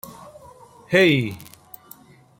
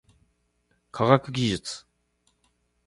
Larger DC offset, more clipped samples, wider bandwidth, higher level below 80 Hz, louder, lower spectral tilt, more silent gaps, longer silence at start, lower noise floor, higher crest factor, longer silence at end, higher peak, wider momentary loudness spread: neither; neither; first, 16.5 kHz vs 11.5 kHz; about the same, -60 dBFS vs -58 dBFS; first, -19 LUFS vs -25 LUFS; about the same, -5.5 dB/octave vs -5.5 dB/octave; neither; second, 0.05 s vs 0.95 s; second, -49 dBFS vs -71 dBFS; about the same, 22 dB vs 26 dB; second, 0.95 s vs 1.1 s; about the same, -2 dBFS vs -2 dBFS; first, 26 LU vs 18 LU